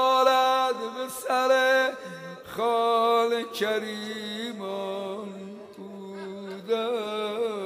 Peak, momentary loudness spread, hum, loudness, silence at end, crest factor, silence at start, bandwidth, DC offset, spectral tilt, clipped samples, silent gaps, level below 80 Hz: -10 dBFS; 18 LU; none; -26 LUFS; 0 s; 18 dB; 0 s; 15.5 kHz; under 0.1%; -3 dB/octave; under 0.1%; none; -74 dBFS